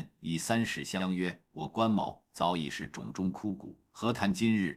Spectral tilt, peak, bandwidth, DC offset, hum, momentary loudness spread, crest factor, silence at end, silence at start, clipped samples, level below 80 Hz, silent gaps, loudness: -5 dB/octave; -12 dBFS; 15.5 kHz; under 0.1%; none; 10 LU; 20 dB; 0 s; 0 s; under 0.1%; -64 dBFS; none; -33 LUFS